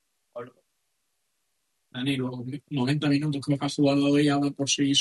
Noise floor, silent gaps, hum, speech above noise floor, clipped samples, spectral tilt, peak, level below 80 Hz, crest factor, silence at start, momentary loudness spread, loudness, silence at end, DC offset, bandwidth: -77 dBFS; none; none; 53 dB; under 0.1%; -4.5 dB/octave; -10 dBFS; -68 dBFS; 16 dB; 0.35 s; 20 LU; -25 LUFS; 0 s; under 0.1%; 12 kHz